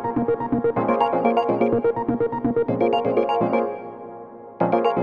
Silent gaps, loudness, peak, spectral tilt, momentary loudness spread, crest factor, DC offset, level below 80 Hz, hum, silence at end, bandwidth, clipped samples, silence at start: none; -21 LUFS; -4 dBFS; -9 dB/octave; 15 LU; 18 dB; under 0.1%; -54 dBFS; none; 0 s; 6.4 kHz; under 0.1%; 0 s